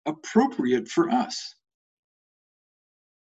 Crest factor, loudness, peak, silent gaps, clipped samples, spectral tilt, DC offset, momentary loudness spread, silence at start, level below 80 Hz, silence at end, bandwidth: 20 dB; -25 LUFS; -6 dBFS; none; under 0.1%; -5 dB/octave; under 0.1%; 10 LU; 0.05 s; -72 dBFS; 1.8 s; 8.2 kHz